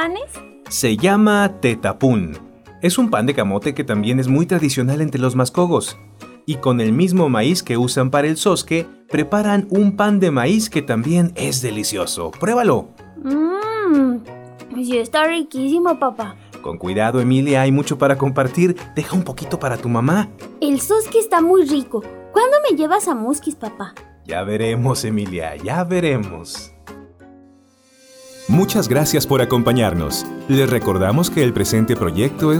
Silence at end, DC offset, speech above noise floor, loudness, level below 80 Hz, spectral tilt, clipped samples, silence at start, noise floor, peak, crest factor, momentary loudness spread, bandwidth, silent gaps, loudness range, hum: 0 s; under 0.1%; 35 dB; -17 LUFS; -48 dBFS; -5.5 dB/octave; under 0.1%; 0 s; -52 dBFS; -4 dBFS; 14 dB; 12 LU; over 20 kHz; none; 5 LU; none